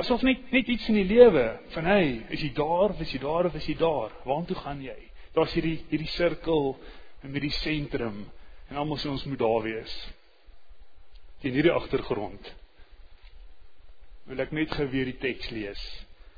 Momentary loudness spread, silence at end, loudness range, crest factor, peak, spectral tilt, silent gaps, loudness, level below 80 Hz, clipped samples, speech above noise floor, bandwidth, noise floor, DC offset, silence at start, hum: 16 LU; 0 s; 10 LU; 24 dB; -4 dBFS; -7.5 dB/octave; none; -27 LUFS; -44 dBFS; under 0.1%; 23 dB; 5 kHz; -50 dBFS; under 0.1%; 0 s; none